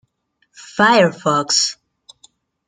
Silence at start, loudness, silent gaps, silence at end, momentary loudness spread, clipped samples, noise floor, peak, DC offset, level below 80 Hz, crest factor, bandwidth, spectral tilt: 0.75 s; -15 LUFS; none; 0.95 s; 8 LU; under 0.1%; -66 dBFS; -2 dBFS; under 0.1%; -64 dBFS; 18 dB; 11 kHz; -3 dB/octave